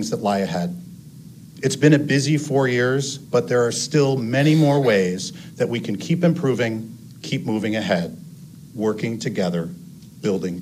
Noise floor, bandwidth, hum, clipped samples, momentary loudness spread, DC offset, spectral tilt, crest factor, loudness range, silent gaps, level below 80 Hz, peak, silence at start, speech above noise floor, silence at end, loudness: -41 dBFS; 15.5 kHz; none; under 0.1%; 16 LU; under 0.1%; -5.5 dB/octave; 20 dB; 6 LU; none; -62 dBFS; -2 dBFS; 0 s; 21 dB; 0 s; -21 LUFS